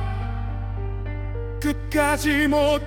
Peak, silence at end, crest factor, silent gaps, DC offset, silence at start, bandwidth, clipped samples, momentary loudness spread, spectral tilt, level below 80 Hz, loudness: -8 dBFS; 0 s; 16 dB; none; under 0.1%; 0 s; 18 kHz; under 0.1%; 11 LU; -5.5 dB/octave; -32 dBFS; -24 LUFS